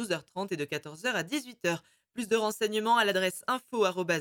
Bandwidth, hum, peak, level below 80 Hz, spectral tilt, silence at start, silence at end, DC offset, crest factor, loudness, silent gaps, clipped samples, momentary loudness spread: 18 kHz; none; -12 dBFS; -78 dBFS; -3.5 dB/octave; 0 s; 0 s; under 0.1%; 18 dB; -30 LUFS; none; under 0.1%; 11 LU